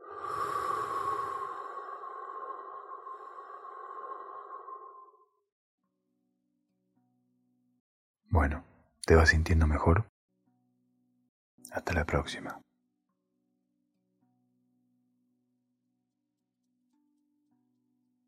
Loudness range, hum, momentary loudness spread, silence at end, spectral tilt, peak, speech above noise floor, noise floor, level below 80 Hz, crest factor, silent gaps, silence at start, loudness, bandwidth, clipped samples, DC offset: 19 LU; none; 20 LU; 5.7 s; -6 dB/octave; -8 dBFS; 57 dB; -84 dBFS; -42 dBFS; 26 dB; 5.52-5.78 s, 7.80-8.14 s, 10.09-10.28 s, 11.29-11.58 s; 0 s; -30 LUFS; 13 kHz; under 0.1%; under 0.1%